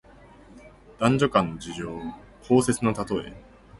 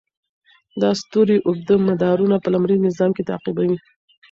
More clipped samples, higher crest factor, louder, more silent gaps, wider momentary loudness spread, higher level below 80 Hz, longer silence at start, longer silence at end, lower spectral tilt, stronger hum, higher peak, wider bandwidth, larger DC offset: neither; first, 22 dB vs 14 dB; second, -25 LUFS vs -19 LUFS; neither; first, 17 LU vs 7 LU; first, -52 dBFS vs -58 dBFS; second, 0.5 s vs 0.75 s; second, 0.05 s vs 0.55 s; second, -5.5 dB/octave vs -7.5 dB/octave; neither; about the same, -6 dBFS vs -4 dBFS; first, 11.5 kHz vs 7.6 kHz; neither